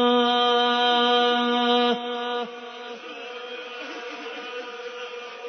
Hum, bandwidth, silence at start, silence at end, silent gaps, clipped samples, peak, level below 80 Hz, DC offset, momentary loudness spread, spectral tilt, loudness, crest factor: none; 6.4 kHz; 0 s; 0 s; none; under 0.1%; -8 dBFS; -86 dBFS; under 0.1%; 16 LU; -3 dB/octave; -21 LUFS; 16 dB